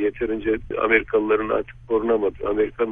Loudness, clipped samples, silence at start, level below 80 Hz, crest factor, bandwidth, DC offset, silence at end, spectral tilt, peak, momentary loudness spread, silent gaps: -22 LUFS; under 0.1%; 0 s; -44 dBFS; 20 dB; 3.7 kHz; under 0.1%; 0 s; -8.5 dB/octave; -2 dBFS; 6 LU; none